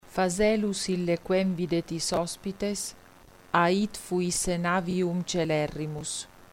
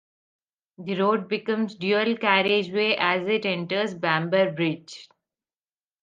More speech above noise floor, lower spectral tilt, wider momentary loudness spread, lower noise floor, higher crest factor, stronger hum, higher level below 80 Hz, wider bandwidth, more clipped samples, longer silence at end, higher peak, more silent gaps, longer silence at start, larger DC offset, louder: second, 26 dB vs over 66 dB; second, -4.5 dB/octave vs -6 dB/octave; about the same, 9 LU vs 9 LU; second, -53 dBFS vs under -90 dBFS; about the same, 20 dB vs 20 dB; neither; first, -52 dBFS vs -74 dBFS; first, 16.5 kHz vs 7.6 kHz; neither; second, 0.05 s vs 0.95 s; second, -8 dBFS vs -4 dBFS; neither; second, 0.05 s vs 0.8 s; neither; second, -28 LUFS vs -24 LUFS